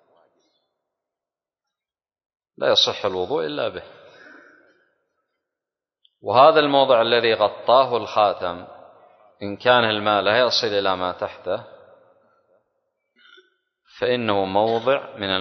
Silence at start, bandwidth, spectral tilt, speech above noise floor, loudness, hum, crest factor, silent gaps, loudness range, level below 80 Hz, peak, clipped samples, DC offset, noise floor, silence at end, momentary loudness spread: 2.6 s; 6.4 kHz; -4 dB/octave; over 71 dB; -19 LUFS; none; 20 dB; none; 11 LU; -60 dBFS; -2 dBFS; under 0.1%; under 0.1%; under -90 dBFS; 0 s; 13 LU